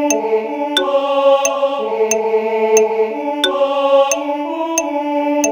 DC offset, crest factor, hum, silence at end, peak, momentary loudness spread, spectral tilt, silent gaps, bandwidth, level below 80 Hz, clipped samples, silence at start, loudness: under 0.1%; 16 dB; none; 0 s; 0 dBFS; 5 LU; -1.5 dB/octave; none; over 20 kHz; -64 dBFS; under 0.1%; 0 s; -16 LUFS